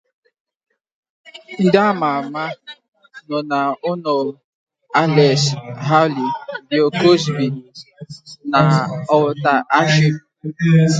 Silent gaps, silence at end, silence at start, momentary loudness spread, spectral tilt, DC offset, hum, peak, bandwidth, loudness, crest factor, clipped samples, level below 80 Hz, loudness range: 2.88-2.92 s, 4.44-4.67 s; 0 s; 1.35 s; 16 LU; -6 dB/octave; under 0.1%; none; 0 dBFS; 9 kHz; -17 LUFS; 18 dB; under 0.1%; -60 dBFS; 5 LU